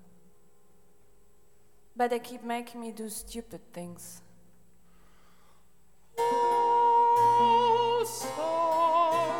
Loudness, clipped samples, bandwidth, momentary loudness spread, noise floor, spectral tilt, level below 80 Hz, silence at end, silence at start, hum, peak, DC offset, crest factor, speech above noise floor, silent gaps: -26 LUFS; under 0.1%; 17.5 kHz; 21 LU; -66 dBFS; -3.5 dB/octave; -64 dBFS; 0 s; 1.95 s; none; -14 dBFS; 0.2%; 14 dB; 30 dB; none